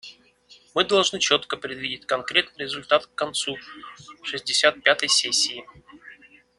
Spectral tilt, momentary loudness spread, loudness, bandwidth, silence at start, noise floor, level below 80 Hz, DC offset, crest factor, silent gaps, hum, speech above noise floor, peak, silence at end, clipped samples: -1 dB/octave; 17 LU; -22 LUFS; 12 kHz; 0.05 s; -55 dBFS; -64 dBFS; under 0.1%; 24 dB; none; none; 30 dB; -2 dBFS; 0.45 s; under 0.1%